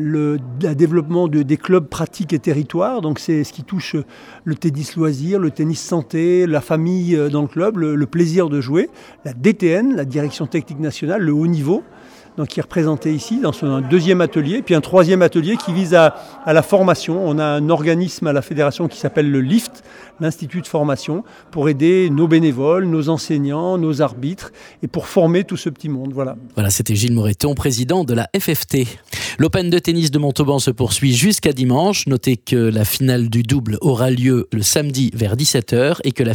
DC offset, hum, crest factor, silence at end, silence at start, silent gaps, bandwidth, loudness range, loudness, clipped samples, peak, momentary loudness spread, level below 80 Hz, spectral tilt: under 0.1%; none; 16 dB; 0 s; 0 s; none; 20 kHz; 5 LU; -17 LUFS; under 0.1%; 0 dBFS; 10 LU; -48 dBFS; -5.5 dB/octave